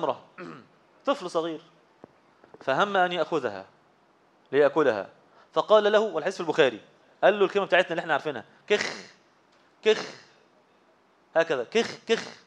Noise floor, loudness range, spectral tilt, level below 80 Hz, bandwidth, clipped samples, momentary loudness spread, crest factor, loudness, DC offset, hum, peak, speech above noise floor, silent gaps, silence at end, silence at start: -62 dBFS; 6 LU; -4 dB/octave; -82 dBFS; 9.8 kHz; under 0.1%; 18 LU; 22 dB; -26 LUFS; under 0.1%; none; -6 dBFS; 37 dB; none; 0.15 s; 0 s